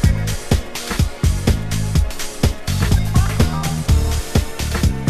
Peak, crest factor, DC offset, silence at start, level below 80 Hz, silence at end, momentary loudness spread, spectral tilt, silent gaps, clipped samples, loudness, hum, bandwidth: -2 dBFS; 16 dB; under 0.1%; 0 s; -20 dBFS; 0 s; 4 LU; -5.5 dB/octave; none; under 0.1%; -19 LUFS; none; 14.5 kHz